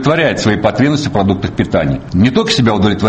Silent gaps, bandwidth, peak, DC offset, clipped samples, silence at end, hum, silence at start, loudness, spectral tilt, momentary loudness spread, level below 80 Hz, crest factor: none; 8.8 kHz; 0 dBFS; under 0.1%; under 0.1%; 0 s; none; 0 s; -13 LUFS; -6 dB/octave; 4 LU; -34 dBFS; 12 dB